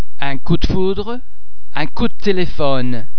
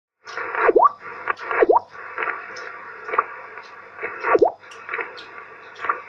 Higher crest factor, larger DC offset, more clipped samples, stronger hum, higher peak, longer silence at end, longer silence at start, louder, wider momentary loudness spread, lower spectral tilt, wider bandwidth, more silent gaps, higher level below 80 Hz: about the same, 20 dB vs 20 dB; first, 40% vs under 0.1%; neither; neither; about the same, 0 dBFS vs -2 dBFS; about the same, 0 s vs 0 s; second, 0 s vs 0.25 s; about the same, -20 LUFS vs -22 LUFS; second, 8 LU vs 20 LU; first, -7 dB/octave vs -5 dB/octave; second, 5.4 kHz vs 7.2 kHz; neither; first, -26 dBFS vs -62 dBFS